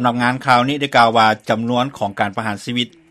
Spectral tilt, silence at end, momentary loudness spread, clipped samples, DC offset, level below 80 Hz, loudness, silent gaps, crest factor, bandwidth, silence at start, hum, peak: -5 dB/octave; 0.25 s; 9 LU; under 0.1%; under 0.1%; -58 dBFS; -17 LUFS; none; 16 dB; 14.5 kHz; 0 s; none; 0 dBFS